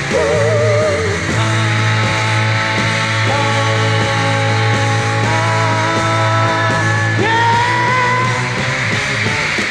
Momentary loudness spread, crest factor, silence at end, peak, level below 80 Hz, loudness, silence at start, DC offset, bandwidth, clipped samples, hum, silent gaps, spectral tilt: 2 LU; 14 dB; 0 s; 0 dBFS; -42 dBFS; -14 LUFS; 0 s; under 0.1%; 11 kHz; under 0.1%; none; none; -4.5 dB/octave